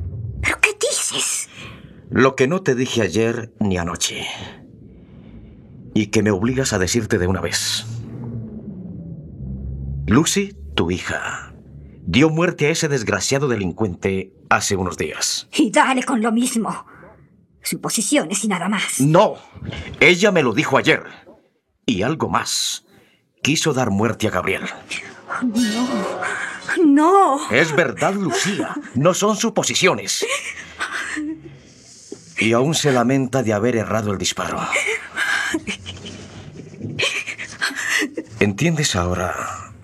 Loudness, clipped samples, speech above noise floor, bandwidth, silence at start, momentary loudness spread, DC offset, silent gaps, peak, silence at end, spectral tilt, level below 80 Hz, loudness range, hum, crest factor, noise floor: -19 LUFS; under 0.1%; 42 dB; 15.5 kHz; 0 s; 15 LU; under 0.1%; none; 0 dBFS; 0 s; -4 dB/octave; -46 dBFS; 6 LU; none; 20 dB; -60 dBFS